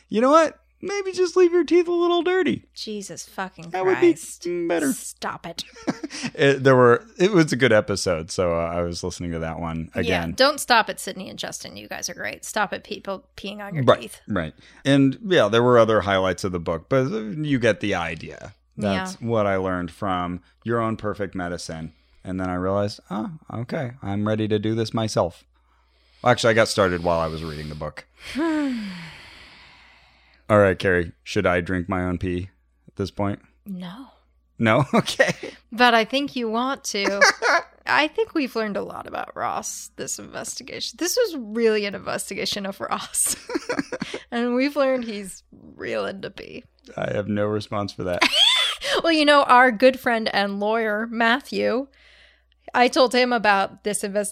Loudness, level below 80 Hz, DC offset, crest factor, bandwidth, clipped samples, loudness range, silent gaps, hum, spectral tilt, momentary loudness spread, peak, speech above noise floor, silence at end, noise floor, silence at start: -22 LUFS; -52 dBFS; under 0.1%; 20 dB; 15.5 kHz; under 0.1%; 8 LU; none; none; -4.5 dB/octave; 16 LU; -2 dBFS; 39 dB; 0 s; -61 dBFS; 0.1 s